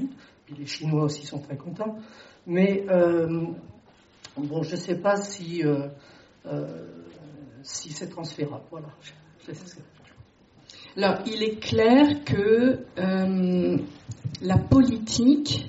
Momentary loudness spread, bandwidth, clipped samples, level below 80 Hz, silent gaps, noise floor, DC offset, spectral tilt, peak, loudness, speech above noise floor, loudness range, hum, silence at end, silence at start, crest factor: 22 LU; 8 kHz; under 0.1%; -52 dBFS; none; -54 dBFS; under 0.1%; -6 dB/octave; -8 dBFS; -25 LUFS; 29 dB; 15 LU; none; 0 s; 0 s; 18 dB